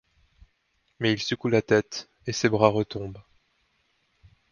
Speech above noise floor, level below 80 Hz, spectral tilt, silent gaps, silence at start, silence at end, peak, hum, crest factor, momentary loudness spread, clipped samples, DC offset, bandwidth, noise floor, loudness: 47 dB; -58 dBFS; -5 dB/octave; none; 1 s; 1.3 s; -2 dBFS; none; 24 dB; 14 LU; under 0.1%; under 0.1%; 7.2 kHz; -71 dBFS; -25 LUFS